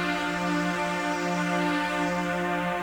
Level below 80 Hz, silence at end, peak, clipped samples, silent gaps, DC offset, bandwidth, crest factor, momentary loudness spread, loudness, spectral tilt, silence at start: -54 dBFS; 0 s; -14 dBFS; under 0.1%; none; under 0.1%; over 20 kHz; 12 dB; 2 LU; -27 LUFS; -5 dB/octave; 0 s